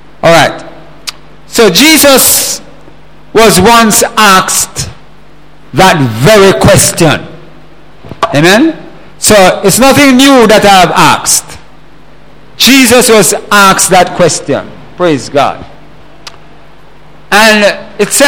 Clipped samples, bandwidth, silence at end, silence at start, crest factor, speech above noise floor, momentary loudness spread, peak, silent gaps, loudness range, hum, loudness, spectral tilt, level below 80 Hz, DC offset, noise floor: 5%; over 20 kHz; 0 s; 0.25 s; 8 dB; 33 dB; 12 LU; 0 dBFS; none; 5 LU; none; -5 LUFS; -3 dB/octave; -32 dBFS; 4%; -37 dBFS